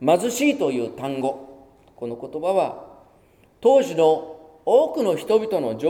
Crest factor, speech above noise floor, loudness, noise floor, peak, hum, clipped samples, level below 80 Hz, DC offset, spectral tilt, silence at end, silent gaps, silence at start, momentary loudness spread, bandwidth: 16 dB; 35 dB; -21 LUFS; -56 dBFS; -6 dBFS; none; under 0.1%; -64 dBFS; under 0.1%; -5 dB/octave; 0 s; none; 0 s; 15 LU; 17 kHz